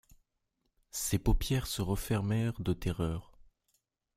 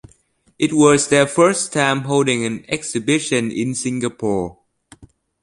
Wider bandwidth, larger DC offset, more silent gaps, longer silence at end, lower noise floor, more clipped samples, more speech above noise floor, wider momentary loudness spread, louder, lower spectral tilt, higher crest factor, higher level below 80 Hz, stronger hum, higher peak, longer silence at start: first, 16 kHz vs 11.5 kHz; neither; neither; first, 0.95 s vs 0.4 s; first, -81 dBFS vs -57 dBFS; neither; first, 49 dB vs 40 dB; second, 6 LU vs 9 LU; second, -34 LUFS vs -18 LUFS; first, -5.5 dB/octave vs -4 dB/octave; about the same, 18 dB vs 18 dB; first, -42 dBFS vs -54 dBFS; neither; second, -16 dBFS vs 0 dBFS; first, 0.95 s vs 0.6 s